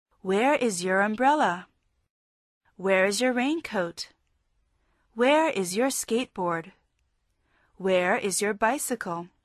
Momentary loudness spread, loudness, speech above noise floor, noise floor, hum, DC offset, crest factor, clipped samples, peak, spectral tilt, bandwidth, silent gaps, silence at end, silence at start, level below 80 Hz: 11 LU; -25 LUFS; 48 dB; -73 dBFS; none; under 0.1%; 18 dB; under 0.1%; -10 dBFS; -3.5 dB/octave; 13.5 kHz; 2.10-2.61 s; 0.2 s; 0.25 s; -68 dBFS